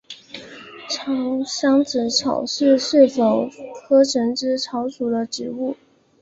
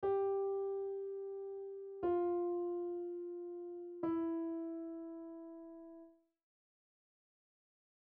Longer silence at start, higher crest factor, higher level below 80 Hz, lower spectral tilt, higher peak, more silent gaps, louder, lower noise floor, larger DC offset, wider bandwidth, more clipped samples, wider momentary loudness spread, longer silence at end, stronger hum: about the same, 0.1 s vs 0 s; about the same, 18 dB vs 14 dB; first, -64 dBFS vs -78 dBFS; second, -3.5 dB/octave vs -7.5 dB/octave; first, -2 dBFS vs -28 dBFS; neither; first, -20 LUFS vs -41 LUFS; second, -39 dBFS vs -61 dBFS; neither; first, 8 kHz vs 3.4 kHz; neither; first, 21 LU vs 16 LU; second, 0.45 s vs 2 s; neither